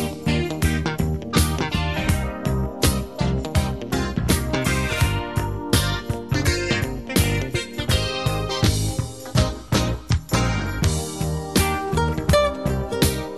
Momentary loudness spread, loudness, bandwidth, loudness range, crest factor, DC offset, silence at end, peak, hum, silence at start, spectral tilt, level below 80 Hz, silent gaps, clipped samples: 5 LU; -22 LUFS; 13.5 kHz; 1 LU; 20 dB; 0.4%; 0 s; -2 dBFS; none; 0 s; -5 dB/octave; -30 dBFS; none; under 0.1%